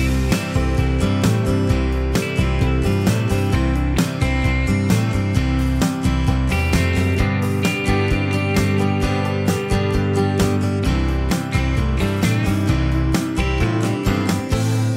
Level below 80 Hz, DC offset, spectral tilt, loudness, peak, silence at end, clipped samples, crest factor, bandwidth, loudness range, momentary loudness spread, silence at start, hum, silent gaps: -24 dBFS; under 0.1%; -6 dB/octave; -19 LUFS; -4 dBFS; 0 s; under 0.1%; 14 dB; 16 kHz; 1 LU; 2 LU; 0 s; none; none